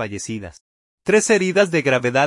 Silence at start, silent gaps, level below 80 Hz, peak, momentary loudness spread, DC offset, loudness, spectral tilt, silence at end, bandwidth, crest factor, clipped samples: 0 s; 0.61-0.98 s; -58 dBFS; -4 dBFS; 15 LU; under 0.1%; -18 LUFS; -4 dB/octave; 0 s; 11.5 kHz; 16 dB; under 0.1%